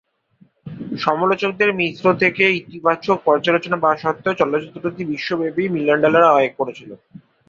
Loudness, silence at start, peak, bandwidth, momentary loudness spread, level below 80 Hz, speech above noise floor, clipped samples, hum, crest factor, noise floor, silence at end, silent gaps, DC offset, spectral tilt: -18 LUFS; 0.65 s; -2 dBFS; 7.4 kHz; 12 LU; -60 dBFS; 38 dB; under 0.1%; none; 18 dB; -56 dBFS; 0.55 s; none; under 0.1%; -6.5 dB/octave